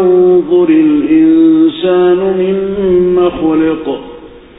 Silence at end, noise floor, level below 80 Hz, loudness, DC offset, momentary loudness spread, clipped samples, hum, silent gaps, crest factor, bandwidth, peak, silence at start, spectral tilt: 0.2 s; -32 dBFS; -40 dBFS; -9 LUFS; under 0.1%; 7 LU; under 0.1%; none; none; 10 dB; 4 kHz; 0 dBFS; 0 s; -13 dB/octave